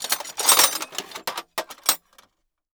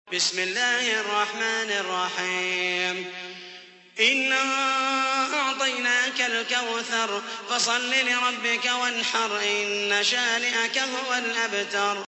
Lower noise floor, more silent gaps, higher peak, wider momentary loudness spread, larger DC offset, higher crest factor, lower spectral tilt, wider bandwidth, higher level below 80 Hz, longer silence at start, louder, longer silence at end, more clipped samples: first, -67 dBFS vs -46 dBFS; neither; first, 0 dBFS vs -6 dBFS; first, 16 LU vs 5 LU; neither; about the same, 24 dB vs 20 dB; second, 2 dB/octave vs -0.5 dB/octave; first, over 20 kHz vs 8.4 kHz; first, -72 dBFS vs -82 dBFS; about the same, 0 s vs 0.05 s; about the same, -21 LUFS vs -23 LUFS; first, 0.8 s vs 0 s; neither